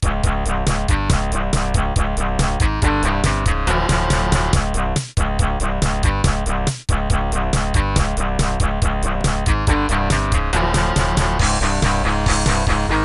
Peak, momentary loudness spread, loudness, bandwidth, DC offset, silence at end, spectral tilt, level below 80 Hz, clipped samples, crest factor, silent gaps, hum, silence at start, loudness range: -4 dBFS; 3 LU; -19 LUFS; 12 kHz; under 0.1%; 0 s; -4.5 dB/octave; -20 dBFS; under 0.1%; 14 dB; none; none; 0 s; 2 LU